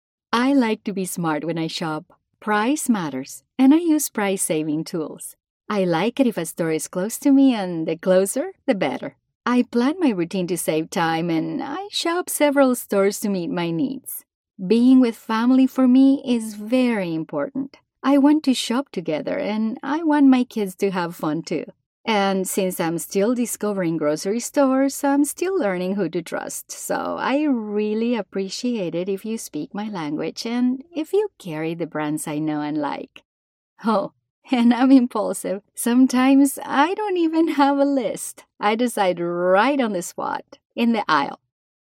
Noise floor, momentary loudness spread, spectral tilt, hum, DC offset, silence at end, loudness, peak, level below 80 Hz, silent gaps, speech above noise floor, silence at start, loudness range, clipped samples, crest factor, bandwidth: under -90 dBFS; 12 LU; -5 dB/octave; none; under 0.1%; 0.65 s; -21 LUFS; -4 dBFS; -70 dBFS; 5.50-5.60 s, 9.35-9.40 s, 14.34-14.44 s, 21.86-22.04 s, 33.25-33.76 s, 34.30-34.42 s, 40.65-40.70 s; over 70 dB; 0.3 s; 6 LU; under 0.1%; 18 dB; 16.5 kHz